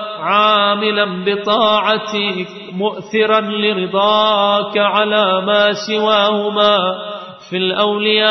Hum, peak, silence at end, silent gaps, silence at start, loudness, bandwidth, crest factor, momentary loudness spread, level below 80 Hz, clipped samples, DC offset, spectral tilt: none; -2 dBFS; 0 s; none; 0 s; -14 LUFS; 6.4 kHz; 14 dB; 9 LU; -64 dBFS; under 0.1%; under 0.1%; -4.5 dB/octave